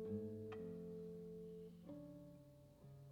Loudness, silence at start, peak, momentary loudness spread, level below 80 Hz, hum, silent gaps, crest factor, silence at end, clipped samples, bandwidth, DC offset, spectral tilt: -54 LUFS; 0 s; -36 dBFS; 14 LU; -76 dBFS; 50 Hz at -75 dBFS; none; 16 dB; 0 s; under 0.1%; 19.5 kHz; under 0.1%; -9 dB/octave